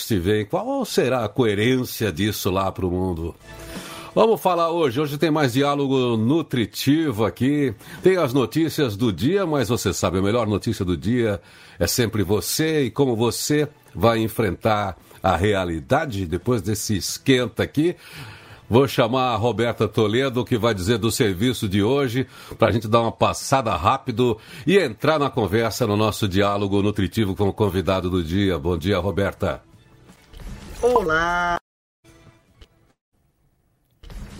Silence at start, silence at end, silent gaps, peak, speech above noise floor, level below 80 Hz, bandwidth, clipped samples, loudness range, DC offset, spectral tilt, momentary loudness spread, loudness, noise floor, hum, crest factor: 0 s; 0 s; 31.61-32.03 s, 33.01-33.12 s; -2 dBFS; 44 dB; -46 dBFS; 16 kHz; under 0.1%; 3 LU; under 0.1%; -5.5 dB/octave; 6 LU; -21 LUFS; -64 dBFS; none; 20 dB